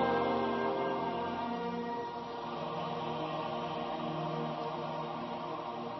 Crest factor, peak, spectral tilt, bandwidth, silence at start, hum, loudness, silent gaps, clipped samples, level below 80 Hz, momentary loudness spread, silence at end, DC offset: 16 dB; -20 dBFS; -4 dB/octave; 6 kHz; 0 s; none; -36 LUFS; none; under 0.1%; -66 dBFS; 7 LU; 0 s; under 0.1%